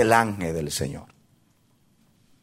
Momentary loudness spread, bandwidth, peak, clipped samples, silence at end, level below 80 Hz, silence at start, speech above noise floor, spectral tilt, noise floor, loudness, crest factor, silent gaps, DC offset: 14 LU; 16 kHz; -2 dBFS; under 0.1%; 1.4 s; -52 dBFS; 0 s; 39 dB; -4.5 dB/octave; -63 dBFS; -25 LUFS; 24 dB; none; under 0.1%